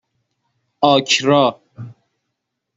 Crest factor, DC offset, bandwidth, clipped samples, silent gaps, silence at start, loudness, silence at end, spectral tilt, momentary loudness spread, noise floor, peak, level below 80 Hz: 18 dB; under 0.1%; 8.2 kHz; under 0.1%; none; 0.8 s; -15 LUFS; 0.85 s; -4 dB/octave; 24 LU; -77 dBFS; -2 dBFS; -62 dBFS